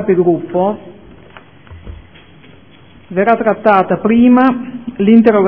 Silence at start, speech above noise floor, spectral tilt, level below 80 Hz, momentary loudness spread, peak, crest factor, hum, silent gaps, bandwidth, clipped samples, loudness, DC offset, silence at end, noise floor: 0 s; 32 dB; -10.5 dB/octave; -44 dBFS; 14 LU; 0 dBFS; 14 dB; none; none; 4.3 kHz; 0.2%; -12 LUFS; 0.5%; 0 s; -42 dBFS